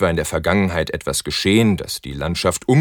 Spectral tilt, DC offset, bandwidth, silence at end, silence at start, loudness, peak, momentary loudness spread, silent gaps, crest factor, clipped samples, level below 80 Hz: -5 dB/octave; under 0.1%; 19 kHz; 0 s; 0 s; -19 LUFS; -2 dBFS; 8 LU; none; 18 dB; under 0.1%; -38 dBFS